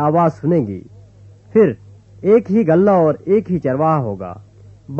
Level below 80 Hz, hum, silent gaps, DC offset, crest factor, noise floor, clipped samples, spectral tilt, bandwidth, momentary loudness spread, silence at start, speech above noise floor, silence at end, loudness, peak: -52 dBFS; none; none; under 0.1%; 14 dB; -43 dBFS; under 0.1%; -10.5 dB/octave; 7 kHz; 14 LU; 0 s; 28 dB; 0 s; -16 LUFS; -2 dBFS